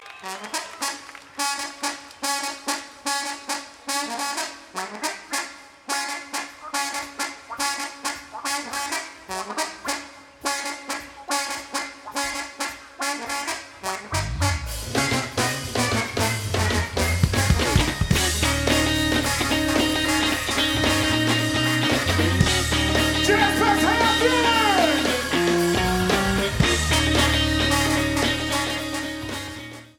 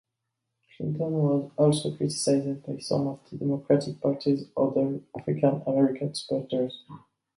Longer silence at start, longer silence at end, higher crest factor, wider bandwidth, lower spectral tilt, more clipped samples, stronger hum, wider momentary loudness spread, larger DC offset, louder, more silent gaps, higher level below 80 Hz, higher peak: second, 0 s vs 0.8 s; second, 0.15 s vs 0.4 s; about the same, 20 dB vs 18 dB; first, 19 kHz vs 11.5 kHz; second, -3.5 dB/octave vs -6.5 dB/octave; neither; neither; first, 12 LU vs 9 LU; neither; first, -23 LUFS vs -27 LUFS; neither; first, -36 dBFS vs -68 dBFS; first, -2 dBFS vs -10 dBFS